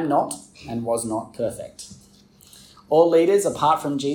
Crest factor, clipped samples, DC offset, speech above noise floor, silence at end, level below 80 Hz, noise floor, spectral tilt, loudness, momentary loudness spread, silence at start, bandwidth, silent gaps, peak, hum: 18 dB; under 0.1%; under 0.1%; 31 dB; 0 s; -60 dBFS; -52 dBFS; -5 dB/octave; -21 LUFS; 19 LU; 0 s; 17.5 kHz; none; -4 dBFS; none